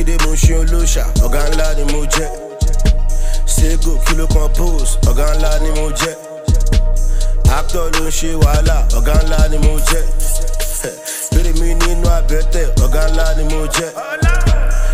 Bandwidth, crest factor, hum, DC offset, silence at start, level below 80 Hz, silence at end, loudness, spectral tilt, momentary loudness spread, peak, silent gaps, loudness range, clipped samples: 15.5 kHz; 12 dB; none; under 0.1%; 0 s; -12 dBFS; 0 s; -16 LUFS; -4.5 dB/octave; 6 LU; 0 dBFS; none; 2 LU; under 0.1%